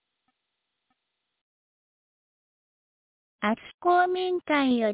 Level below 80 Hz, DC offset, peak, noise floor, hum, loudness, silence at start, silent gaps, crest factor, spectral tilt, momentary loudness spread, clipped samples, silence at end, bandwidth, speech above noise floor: -72 dBFS; under 0.1%; -12 dBFS; -82 dBFS; none; -25 LUFS; 3.4 s; 3.74-3.78 s; 18 dB; -8.5 dB/octave; 6 LU; under 0.1%; 0 s; 4 kHz; 57 dB